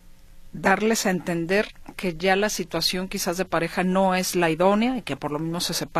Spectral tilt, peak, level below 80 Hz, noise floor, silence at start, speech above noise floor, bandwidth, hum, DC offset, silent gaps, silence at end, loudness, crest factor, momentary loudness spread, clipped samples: -4 dB/octave; -6 dBFS; -48 dBFS; -44 dBFS; 0.05 s; 21 dB; 14.5 kHz; none; under 0.1%; none; 0 s; -23 LUFS; 18 dB; 8 LU; under 0.1%